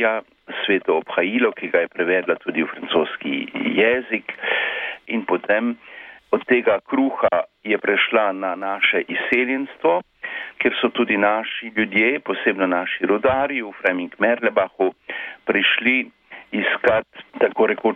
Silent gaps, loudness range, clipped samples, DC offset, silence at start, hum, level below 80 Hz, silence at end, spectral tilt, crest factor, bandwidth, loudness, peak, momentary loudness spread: none; 2 LU; under 0.1%; under 0.1%; 0 s; none; -62 dBFS; 0 s; -7 dB/octave; 16 dB; 4.7 kHz; -20 LUFS; -4 dBFS; 9 LU